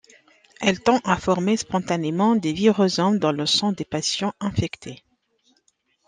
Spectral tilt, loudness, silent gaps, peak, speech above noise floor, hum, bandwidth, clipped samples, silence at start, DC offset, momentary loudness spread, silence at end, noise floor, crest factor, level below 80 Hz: -4.5 dB/octave; -22 LUFS; none; -4 dBFS; 45 dB; none; 9.8 kHz; under 0.1%; 0.6 s; under 0.1%; 6 LU; 1.1 s; -67 dBFS; 18 dB; -54 dBFS